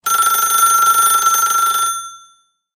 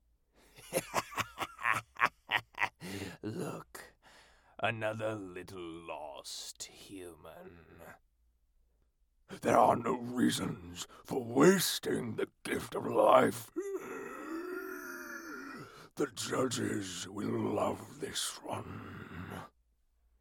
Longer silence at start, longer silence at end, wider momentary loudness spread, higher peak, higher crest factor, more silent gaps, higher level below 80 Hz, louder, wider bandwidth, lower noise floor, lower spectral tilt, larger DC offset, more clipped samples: second, 0.05 s vs 0.55 s; second, 0.6 s vs 0.75 s; second, 9 LU vs 20 LU; first, -2 dBFS vs -10 dBFS; second, 14 dB vs 26 dB; neither; about the same, -66 dBFS vs -68 dBFS; first, -12 LUFS vs -34 LUFS; second, 17 kHz vs 19 kHz; second, -53 dBFS vs -73 dBFS; second, 2.5 dB/octave vs -4 dB/octave; neither; neither